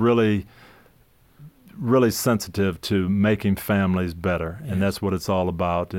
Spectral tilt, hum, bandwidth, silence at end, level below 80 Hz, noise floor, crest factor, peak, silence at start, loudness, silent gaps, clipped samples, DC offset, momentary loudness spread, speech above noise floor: -6 dB/octave; none; 17 kHz; 0 s; -48 dBFS; -57 dBFS; 14 dB; -8 dBFS; 0 s; -23 LUFS; none; under 0.1%; under 0.1%; 6 LU; 35 dB